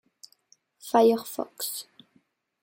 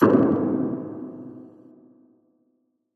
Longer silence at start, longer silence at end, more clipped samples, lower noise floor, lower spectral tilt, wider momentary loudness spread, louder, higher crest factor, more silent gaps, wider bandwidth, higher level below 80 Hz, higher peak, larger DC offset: first, 0.85 s vs 0 s; second, 0.8 s vs 1.5 s; neither; about the same, -68 dBFS vs -71 dBFS; second, -3.5 dB/octave vs -10 dB/octave; second, 16 LU vs 23 LU; second, -26 LUFS vs -23 LUFS; about the same, 22 dB vs 22 dB; neither; first, 17 kHz vs 4.8 kHz; second, -78 dBFS vs -66 dBFS; second, -8 dBFS vs -4 dBFS; neither